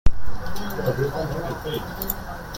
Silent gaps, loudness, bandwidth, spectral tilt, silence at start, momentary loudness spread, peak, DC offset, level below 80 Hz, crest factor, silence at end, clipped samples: none; -28 LUFS; 17 kHz; -5.5 dB/octave; 0.05 s; 8 LU; -2 dBFS; under 0.1%; -32 dBFS; 18 dB; 0 s; under 0.1%